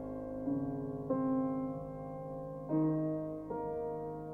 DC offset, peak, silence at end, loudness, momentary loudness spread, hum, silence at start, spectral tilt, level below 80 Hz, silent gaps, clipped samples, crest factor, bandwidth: under 0.1%; -22 dBFS; 0 s; -37 LUFS; 10 LU; none; 0 s; -11.5 dB/octave; -60 dBFS; none; under 0.1%; 14 dB; 2.7 kHz